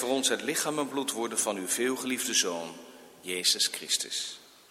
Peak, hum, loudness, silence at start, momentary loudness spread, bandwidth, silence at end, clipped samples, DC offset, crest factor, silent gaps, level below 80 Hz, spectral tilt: -12 dBFS; none; -28 LUFS; 0 s; 12 LU; 16 kHz; 0.25 s; under 0.1%; under 0.1%; 20 dB; none; -78 dBFS; -1 dB/octave